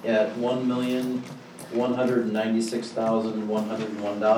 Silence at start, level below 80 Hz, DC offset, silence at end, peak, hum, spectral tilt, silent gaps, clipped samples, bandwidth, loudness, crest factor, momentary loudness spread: 0 s; -76 dBFS; under 0.1%; 0 s; -8 dBFS; none; -6 dB/octave; none; under 0.1%; 16.5 kHz; -26 LUFS; 18 dB; 7 LU